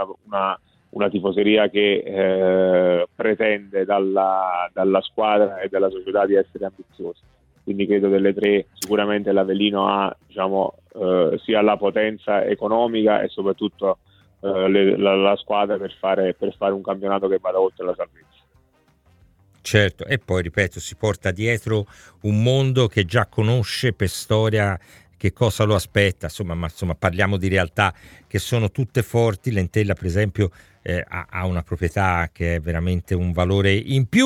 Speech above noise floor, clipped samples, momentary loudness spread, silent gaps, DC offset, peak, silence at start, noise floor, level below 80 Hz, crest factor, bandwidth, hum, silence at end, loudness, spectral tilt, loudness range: 39 dB; under 0.1%; 9 LU; none; under 0.1%; 0 dBFS; 0 s; -60 dBFS; -44 dBFS; 20 dB; 16.5 kHz; none; 0 s; -21 LUFS; -6 dB/octave; 4 LU